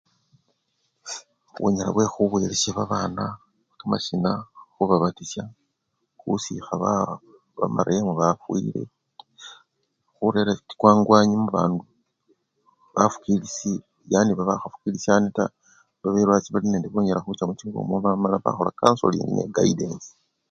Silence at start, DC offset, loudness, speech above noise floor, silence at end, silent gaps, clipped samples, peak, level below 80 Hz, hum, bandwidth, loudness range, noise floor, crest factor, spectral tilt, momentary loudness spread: 1.05 s; under 0.1%; -23 LUFS; 53 dB; 0.45 s; none; under 0.1%; 0 dBFS; -56 dBFS; none; 7.8 kHz; 5 LU; -76 dBFS; 24 dB; -5.5 dB/octave; 15 LU